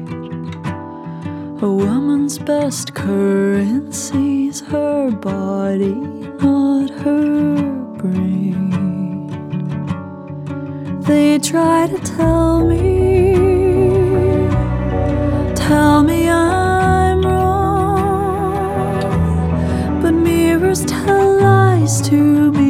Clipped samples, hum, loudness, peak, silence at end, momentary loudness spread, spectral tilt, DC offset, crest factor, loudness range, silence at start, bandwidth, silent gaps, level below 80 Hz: under 0.1%; none; -15 LUFS; 0 dBFS; 0 s; 13 LU; -6.5 dB/octave; under 0.1%; 14 dB; 5 LU; 0 s; 15.5 kHz; none; -30 dBFS